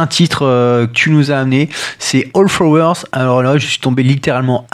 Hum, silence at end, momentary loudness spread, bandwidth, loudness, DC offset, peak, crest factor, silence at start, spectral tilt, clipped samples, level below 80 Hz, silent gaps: none; 0.1 s; 4 LU; 13.5 kHz; -12 LUFS; under 0.1%; 0 dBFS; 12 dB; 0 s; -5.5 dB/octave; under 0.1%; -50 dBFS; none